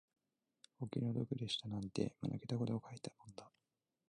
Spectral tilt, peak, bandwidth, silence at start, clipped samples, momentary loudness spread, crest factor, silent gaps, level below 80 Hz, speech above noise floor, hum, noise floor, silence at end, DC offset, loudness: -6.5 dB/octave; -24 dBFS; 10.5 kHz; 0.8 s; under 0.1%; 13 LU; 20 dB; none; -72 dBFS; 47 dB; none; -90 dBFS; 0.6 s; under 0.1%; -43 LUFS